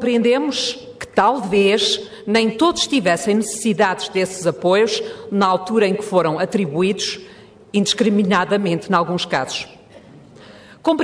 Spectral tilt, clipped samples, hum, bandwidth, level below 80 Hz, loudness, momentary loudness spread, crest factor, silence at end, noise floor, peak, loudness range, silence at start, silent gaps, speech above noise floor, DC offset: -4.5 dB/octave; under 0.1%; none; 11 kHz; -56 dBFS; -18 LUFS; 8 LU; 16 dB; 0 s; -43 dBFS; -2 dBFS; 2 LU; 0 s; none; 25 dB; under 0.1%